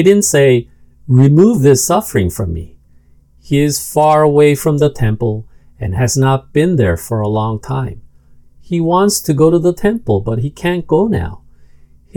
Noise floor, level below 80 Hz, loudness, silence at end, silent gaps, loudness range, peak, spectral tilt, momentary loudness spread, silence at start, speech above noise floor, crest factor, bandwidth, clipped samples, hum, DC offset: -46 dBFS; -38 dBFS; -13 LUFS; 0.8 s; none; 3 LU; 0 dBFS; -6 dB/octave; 12 LU; 0 s; 34 dB; 14 dB; 19 kHz; 0.2%; none; under 0.1%